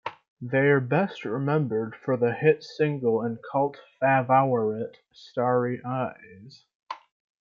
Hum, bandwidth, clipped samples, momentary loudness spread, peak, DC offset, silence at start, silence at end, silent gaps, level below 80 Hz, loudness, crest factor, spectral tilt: none; 7 kHz; under 0.1%; 15 LU; -8 dBFS; under 0.1%; 0.05 s; 0.45 s; 0.28-0.37 s, 6.75-6.80 s; -72 dBFS; -25 LUFS; 18 dB; -8.5 dB/octave